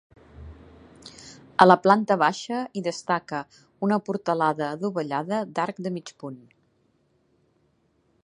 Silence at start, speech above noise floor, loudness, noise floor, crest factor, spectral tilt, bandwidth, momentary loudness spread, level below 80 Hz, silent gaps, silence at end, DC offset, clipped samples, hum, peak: 0.4 s; 43 dB; -24 LUFS; -67 dBFS; 26 dB; -5.5 dB/octave; 10.5 kHz; 25 LU; -58 dBFS; none; 1.9 s; under 0.1%; under 0.1%; none; 0 dBFS